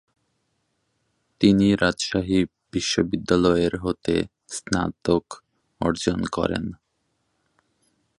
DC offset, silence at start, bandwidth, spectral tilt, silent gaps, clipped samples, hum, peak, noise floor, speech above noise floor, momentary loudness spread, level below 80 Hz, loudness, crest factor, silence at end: under 0.1%; 1.4 s; 11.5 kHz; -5 dB/octave; none; under 0.1%; none; -4 dBFS; -73 dBFS; 51 dB; 10 LU; -46 dBFS; -23 LUFS; 20 dB; 1.45 s